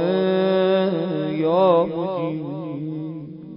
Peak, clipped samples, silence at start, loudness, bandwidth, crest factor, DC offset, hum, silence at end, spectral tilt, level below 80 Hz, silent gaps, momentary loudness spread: -6 dBFS; under 0.1%; 0 s; -21 LUFS; 5.4 kHz; 14 dB; under 0.1%; none; 0 s; -12 dB/octave; -64 dBFS; none; 12 LU